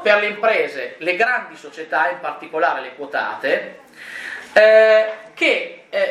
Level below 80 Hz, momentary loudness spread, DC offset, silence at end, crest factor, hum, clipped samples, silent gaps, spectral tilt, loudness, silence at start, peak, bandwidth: -74 dBFS; 18 LU; under 0.1%; 0 s; 18 dB; none; under 0.1%; none; -3 dB/octave; -18 LUFS; 0 s; 0 dBFS; 11 kHz